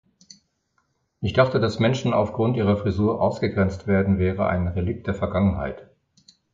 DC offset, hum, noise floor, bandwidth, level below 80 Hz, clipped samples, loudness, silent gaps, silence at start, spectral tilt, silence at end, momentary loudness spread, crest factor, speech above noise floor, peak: under 0.1%; none; -70 dBFS; 7.6 kHz; -38 dBFS; under 0.1%; -23 LUFS; none; 1.2 s; -7.5 dB/octave; 0.7 s; 7 LU; 20 dB; 49 dB; -4 dBFS